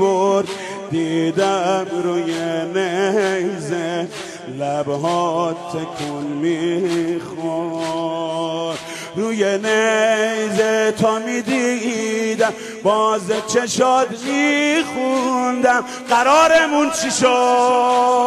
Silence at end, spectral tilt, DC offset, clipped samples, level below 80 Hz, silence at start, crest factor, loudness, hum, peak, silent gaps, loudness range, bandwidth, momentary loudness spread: 0 s; -4 dB/octave; under 0.1%; under 0.1%; -62 dBFS; 0 s; 14 dB; -18 LUFS; none; -4 dBFS; none; 6 LU; 13 kHz; 10 LU